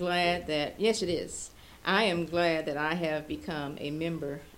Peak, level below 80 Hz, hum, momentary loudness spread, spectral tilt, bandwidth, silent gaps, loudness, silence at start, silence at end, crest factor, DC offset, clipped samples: -12 dBFS; -56 dBFS; none; 10 LU; -4.5 dB/octave; 17 kHz; none; -30 LUFS; 0 s; 0 s; 20 dB; under 0.1%; under 0.1%